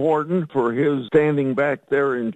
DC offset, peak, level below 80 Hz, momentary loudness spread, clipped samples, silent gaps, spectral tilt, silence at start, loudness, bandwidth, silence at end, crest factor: under 0.1%; -4 dBFS; -60 dBFS; 4 LU; under 0.1%; none; -8.5 dB/octave; 0 s; -20 LUFS; 8.2 kHz; 0 s; 16 dB